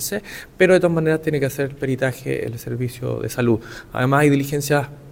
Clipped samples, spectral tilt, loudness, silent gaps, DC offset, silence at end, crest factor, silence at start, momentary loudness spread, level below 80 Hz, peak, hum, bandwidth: under 0.1%; -6 dB/octave; -20 LUFS; none; under 0.1%; 0 s; 18 dB; 0 s; 11 LU; -48 dBFS; -2 dBFS; none; 17.5 kHz